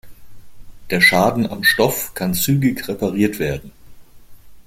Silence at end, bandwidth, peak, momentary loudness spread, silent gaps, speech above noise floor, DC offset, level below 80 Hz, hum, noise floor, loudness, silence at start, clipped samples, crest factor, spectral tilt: 0.05 s; 16.5 kHz; 0 dBFS; 11 LU; none; 22 dB; under 0.1%; -44 dBFS; none; -39 dBFS; -17 LUFS; 0.05 s; under 0.1%; 20 dB; -4.5 dB/octave